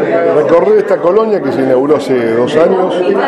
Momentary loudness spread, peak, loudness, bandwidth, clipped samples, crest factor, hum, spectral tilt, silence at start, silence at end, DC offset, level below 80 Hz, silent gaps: 3 LU; 0 dBFS; -10 LUFS; 11.5 kHz; under 0.1%; 10 dB; none; -7 dB/octave; 0 s; 0 s; under 0.1%; -52 dBFS; none